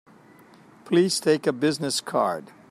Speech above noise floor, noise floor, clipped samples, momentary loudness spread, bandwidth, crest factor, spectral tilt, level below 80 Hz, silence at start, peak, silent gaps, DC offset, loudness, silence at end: 29 dB; -52 dBFS; under 0.1%; 5 LU; 15.5 kHz; 16 dB; -4.5 dB/octave; -72 dBFS; 0.85 s; -8 dBFS; none; under 0.1%; -23 LUFS; 0.25 s